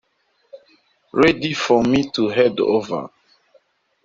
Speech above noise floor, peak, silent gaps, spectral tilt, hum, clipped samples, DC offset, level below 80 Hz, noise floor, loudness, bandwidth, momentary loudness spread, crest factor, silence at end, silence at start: 48 dB; -2 dBFS; none; -5.5 dB/octave; none; under 0.1%; under 0.1%; -52 dBFS; -65 dBFS; -18 LUFS; 7.8 kHz; 11 LU; 20 dB; 0.95 s; 0.55 s